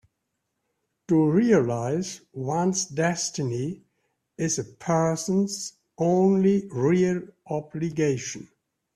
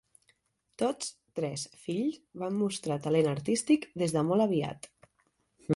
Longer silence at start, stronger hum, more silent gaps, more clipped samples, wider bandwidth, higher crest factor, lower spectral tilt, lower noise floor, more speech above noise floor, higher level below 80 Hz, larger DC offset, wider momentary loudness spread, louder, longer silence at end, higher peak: first, 1.1 s vs 0.8 s; neither; neither; neither; about the same, 12.5 kHz vs 11.5 kHz; about the same, 18 dB vs 18 dB; about the same, -5.5 dB/octave vs -5.5 dB/octave; first, -79 dBFS vs -74 dBFS; first, 55 dB vs 44 dB; about the same, -64 dBFS vs -68 dBFS; neither; about the same, 13 LU vs 11 LU; first, -25 LUFS vs -31 LUFS; first, 0.5 s vs 0 s; first, -8 dBFS vs -14 dBFS